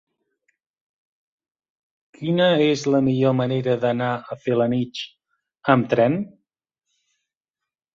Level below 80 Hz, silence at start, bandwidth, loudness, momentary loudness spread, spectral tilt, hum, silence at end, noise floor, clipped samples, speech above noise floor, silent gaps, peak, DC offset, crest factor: -62 dBFS; 2.2 s; 7.6 kHz; -21 LUFS; 12 LU; -6.5 dB/octave; none; 1.65 s; -87 dBFS; under 0.1%; 67 dB; none; -2 dBFS; under 0.1%; 20 dB